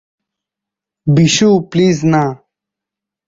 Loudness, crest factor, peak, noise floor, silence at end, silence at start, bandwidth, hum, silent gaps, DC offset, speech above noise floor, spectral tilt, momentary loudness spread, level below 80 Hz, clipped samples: -12 LUFS; 14 dB; -2 dBFS; -84 dBFS; 0.9 s; 1.05 s; 7.8 kHz; 50 Hz at -35 dBFS; none; under 0.1%; 73 dB; -5.5 dB/octave; 8 LU; -50 dBFS; under 0.1%